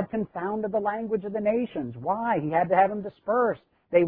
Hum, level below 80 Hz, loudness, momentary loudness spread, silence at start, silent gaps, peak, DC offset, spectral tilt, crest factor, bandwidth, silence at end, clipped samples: none; -64 dBFS; -27 LUFS; 9 LU; 0 s; none; -8 dBFS; under 0.1%; -11 dB/octave; 18 dB; 4.5 kHz; 0 s; under 0.1%